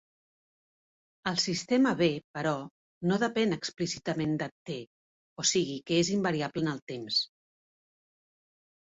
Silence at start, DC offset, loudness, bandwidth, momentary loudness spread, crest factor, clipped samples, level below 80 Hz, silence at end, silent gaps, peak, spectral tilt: 1.25 s; under 0.1%; -30 LUFS; 8 kHz; 11 LU; 20 dB; under 0.1%; -68 dBFS; 1.65 s; 2.24-2.34 s, 2.71-3.01 s, 4.51-4.66 s, 4.87-5.36 s, 6.82-6.87 s; -12 dBFS; -4 dB/octave